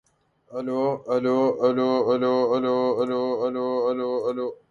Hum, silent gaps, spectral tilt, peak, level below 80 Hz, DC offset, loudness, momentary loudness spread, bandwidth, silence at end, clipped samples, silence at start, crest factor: none; none; -7.5 dB/octave; -10 dBFS; -70 dBFS; under 0.1%; -24 LUFS; 7 LU; 7 kHz; 0.15 s; under 0.1%; 0.5 s; 14 dB